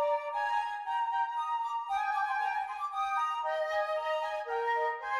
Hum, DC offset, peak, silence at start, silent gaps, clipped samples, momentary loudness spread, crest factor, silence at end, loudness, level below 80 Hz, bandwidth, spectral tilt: none; under 0.1%; -20 dBFS; 0 s; none; under 0.1%; 3 LU; 12 dB; 0 s; -32 LUFS; -74 dBFS; 12.5 kHz; 0.5 dB/octave